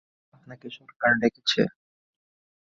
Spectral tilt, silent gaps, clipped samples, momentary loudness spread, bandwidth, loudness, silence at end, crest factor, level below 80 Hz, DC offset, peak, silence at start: -4.5 dB/octave; 0.96-1.00 s; under 0.1%; 20 LU; 7.8 kHz; -24 LUFS; 1 s; 20 dB; -64 dBFS; under 0.1%; -8 dBFS; 0.5 s